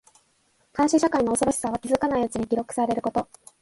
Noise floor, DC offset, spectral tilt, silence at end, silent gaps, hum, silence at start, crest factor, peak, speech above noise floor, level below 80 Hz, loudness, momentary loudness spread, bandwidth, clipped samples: -66 dBFS; under 0.1%; -4.5 dB/octave; 0.4 s; none; none; 0.75 s; 16 dB; -8 dBFS; 42 dB; -54 dBFS; -24 LUFS; 8 LU; 11.5 kHz; under 0.1%